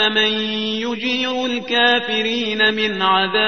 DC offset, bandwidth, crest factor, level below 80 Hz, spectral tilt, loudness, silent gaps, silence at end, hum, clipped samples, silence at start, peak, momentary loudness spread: 0.5%; 6.6 kHz; 16 dB; -58 dBFS; -3.5 dB/octave; -17 LUFS; none; 0 s; none; under 0.1%; 0 s; -2 dBFS; 6 LU